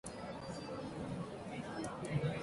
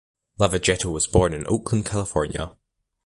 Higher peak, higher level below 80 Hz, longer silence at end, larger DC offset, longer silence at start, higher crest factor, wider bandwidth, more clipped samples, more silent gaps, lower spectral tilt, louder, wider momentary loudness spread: second, -24 dBFS vs -4 dBFS; second, -62 dBFS vs -38 dBFS; second, 0 s vs 0.55 s; neither; second, 0.05 s vs 0.4 s; about the same, 18 dB vs 20 dB; about the same, 11.5 kHz vs 11.5 kHz; neither; neither; first, -6 dB/octave vs -4.5 dB/octave; second, -43 LUFS vs -23 LUFS; about the same, 7 LU vs 8 LU